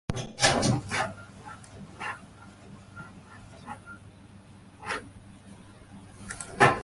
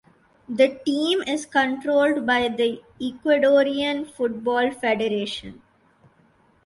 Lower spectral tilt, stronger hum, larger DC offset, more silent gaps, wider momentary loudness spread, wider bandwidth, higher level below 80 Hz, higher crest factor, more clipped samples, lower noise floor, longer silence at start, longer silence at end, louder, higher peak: about the same, -3.5 dB/octave vs -4 dB/octave; neither; neither; neither; first, 27 LU vs 11 LU; about the same, 11.5 kHz vs 11.5 kHz; first, -52 dBFS vs -62 dBFS; first, 26 dB vs 18 dB; neither; second, -51 dBFS vs -59 dBFS; second, 0.1 s vs 0.5 s; second, 0 s vs 1.1 s; second, -28 LUFS vs -22 LUFS; about the same, -6 dBFS vs -6 dBFS